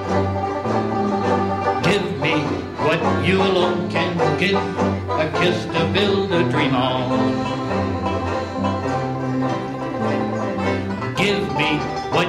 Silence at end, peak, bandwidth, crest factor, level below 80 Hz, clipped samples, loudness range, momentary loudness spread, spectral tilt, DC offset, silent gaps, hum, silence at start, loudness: 0 s; -6 dBFS; 13 kHz; 14 dB; -48 dBFS; under 0.1%; 3 LU; 5 LU; -6 dB/octave; under 0.1%; none; none; 0 s; -20 LUFS